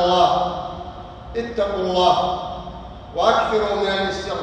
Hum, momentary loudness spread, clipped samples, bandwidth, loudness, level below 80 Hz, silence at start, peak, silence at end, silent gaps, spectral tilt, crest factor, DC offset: none; 17 LU; under 0.1%; 9.2 kHz; -20 LUFS; -42 dBFS; 0 s; -2 dBFS; 0 s; none; -5 dB/octave; 18 dB; under 0.1%